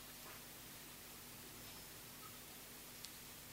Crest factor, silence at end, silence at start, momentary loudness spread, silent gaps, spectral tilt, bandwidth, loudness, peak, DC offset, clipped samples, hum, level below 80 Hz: 30 dB; 0 s; 0 s; 1 LU; none; -2 dB/octave; 16 kHz; -53 LUFS; -26 dBFS; under 0.1%; under 0.1%; 50 Hz at -70 dBFS; -72 dBFS